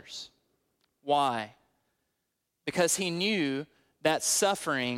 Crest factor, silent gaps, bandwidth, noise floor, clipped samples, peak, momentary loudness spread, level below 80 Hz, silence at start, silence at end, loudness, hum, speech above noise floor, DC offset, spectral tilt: 20 dB; none; 16.5 kHz; -82 dBFS; under 0.1%; -12 dBFS; 18 LU; -74 dBFS; 0.05 s; 0 s; -28 LUFS; none; 53 dB; under 0.1%; -2.5 dB/octave